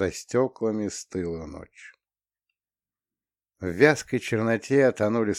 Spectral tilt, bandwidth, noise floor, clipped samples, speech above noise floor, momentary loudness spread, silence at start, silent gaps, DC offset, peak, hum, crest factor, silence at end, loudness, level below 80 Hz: -5.5 dB/octave; 14.5 kHz; under -90 dBFS; under 0.1%; over 65 dB; 15 LU; 0 s; none; under 0.1%; -4 dBFS; none; 24 dB; 0 s; -25 LUFS; -56 dBFS